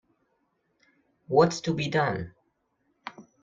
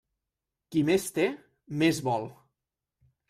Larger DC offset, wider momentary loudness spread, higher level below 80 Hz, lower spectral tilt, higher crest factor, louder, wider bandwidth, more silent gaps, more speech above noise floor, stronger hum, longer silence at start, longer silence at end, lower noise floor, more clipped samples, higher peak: neither; first, 21 LU vs 14 LU; about the same, -62 dBFS vs -66 dBFS; about the same, -5.5 dB/octave vs -5.5 dB/octave; about the same, 22 dB vs 18 dB; about the same, -26 LUFS vs -28 LUFS; second, 7.8 kHz vs 15 kHz; neither; second, 49 dB vs 60 dB; neither; first, 1.3 s vs 0.7 s; second, 0.2 s vs 0.95 s; second, -74 dBFS vs -87 dBFS; neither; first, -8 dBFS vs -12 dBFS